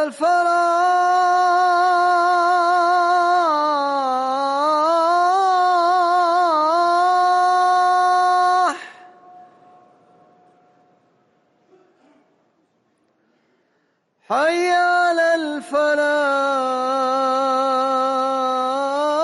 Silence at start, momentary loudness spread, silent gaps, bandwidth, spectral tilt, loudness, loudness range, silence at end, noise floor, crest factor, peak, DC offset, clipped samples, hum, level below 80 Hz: 0 s; 4 LU; none; 11.5 kHz; -2 dB/octave; -17 LUFS; 6 LU; 0 s; -66 dBFS; 10 dB; -8 dBFS; under 0.1%; under 0.1%; none; -72 dBFS